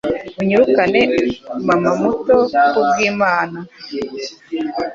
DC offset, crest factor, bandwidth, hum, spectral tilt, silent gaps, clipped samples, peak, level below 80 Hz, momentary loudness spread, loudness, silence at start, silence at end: under 0.1%; 14 dB; 7.6 kHz; none; -5.5 dB/octave; none; under 0.1%; -2 dBFS; -50 dBFS; 13 LU; -16 LUFS; 0.05 s; 0 s